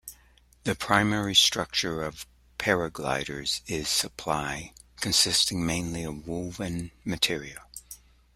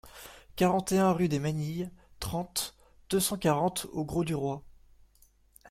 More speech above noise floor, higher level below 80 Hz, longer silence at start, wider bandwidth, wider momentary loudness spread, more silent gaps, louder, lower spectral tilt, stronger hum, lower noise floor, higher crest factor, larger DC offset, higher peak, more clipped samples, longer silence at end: about the same, 31 dB vs 34 dB; about the same, -52 dBFS vs -54 dBFS; about the same, 0.05 s vs 0.05 s; about the same, 16 kHz vs 16.5 kHz; first, 21 LU vs 15 LU; neither; first, -26 LUFS vs -30 LUFS; second, -2.5 dB/octave vs -5 dB/octave; neither; second, -59 dBFS vs -63 dBFS; first, 26 dB vs 18 dB; neither; first, -4 dBFS vs -12 dBFS; neither; first, 0.4 s vs 0 s